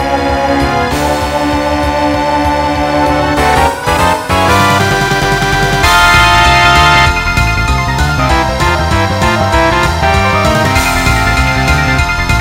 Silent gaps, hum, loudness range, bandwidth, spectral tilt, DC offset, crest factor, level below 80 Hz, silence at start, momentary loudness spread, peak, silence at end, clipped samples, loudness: none; none; 4 LU; 16.5 kHz; -4.5 dB/octave; under 0.1%; 10 dB; -20 dBFS; 0 s; 7 LU; 0 dBFS; 0 s; 0.2%; -10 LUFS